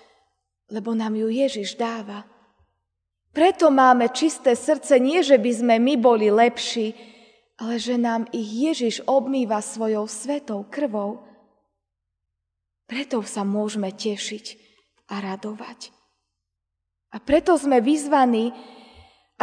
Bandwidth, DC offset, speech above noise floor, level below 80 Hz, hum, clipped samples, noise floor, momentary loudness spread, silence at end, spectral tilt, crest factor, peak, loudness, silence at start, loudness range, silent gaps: 10 kHz; under 0.1%; 61 dB; -60 dBFS; none; under 0.1%; -82 dBFS; 17 LU; 0.7 s; -4.5 dB/octave; 20 dB; -2 dBFS; -21 LUFS; 0.7 s; 12 LU; none